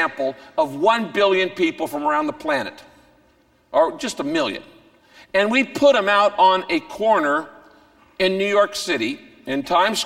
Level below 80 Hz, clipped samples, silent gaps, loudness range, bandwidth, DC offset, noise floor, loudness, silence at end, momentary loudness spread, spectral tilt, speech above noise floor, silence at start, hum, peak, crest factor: -60 dBFS; under 0.1%; none; 5 LU; 16.5 kHz; under 0.1%; -58 dBFS; -20 LUFS; 0 s; 10 LU; -3.5 dB/octave; 39 dB; 0 s; none; -4 dBFS; 16 dB